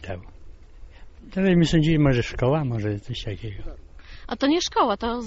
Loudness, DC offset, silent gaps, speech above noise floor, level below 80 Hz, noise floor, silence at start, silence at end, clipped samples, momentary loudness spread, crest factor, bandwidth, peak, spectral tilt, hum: -22 LUFS; under 0.1%; none; 21 dB; -38 dBFS; -43 dBFS; 0 s; 0 s; under 0.1%; 18 LU; 16 dB; 8 kHz; -8 dBFS; -5.5 dB/octave; none